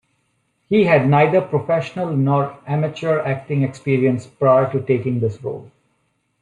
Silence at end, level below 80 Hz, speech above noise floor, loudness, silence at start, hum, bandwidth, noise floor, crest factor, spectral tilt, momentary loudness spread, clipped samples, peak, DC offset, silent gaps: 0.75 s; -60 dBFS; 50 dB; -18 LUFS; 0.7 s; none; 9.6 kHz; -67 dBFS; 18 dB; -8.5 dB/octave; 8 LU; under 0.1%; -2 dBFS; under 0.1%; none